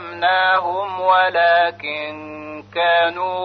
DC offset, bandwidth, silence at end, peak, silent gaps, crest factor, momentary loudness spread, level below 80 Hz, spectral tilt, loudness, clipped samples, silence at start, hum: under 0.1%; 5.4 kHz; 0 s; -4 dBFS; none; 14 dB; 15 LU; -66 dBFS; -5.5 dB/octave; -17 LUFS; under 0.1%; 0 s; none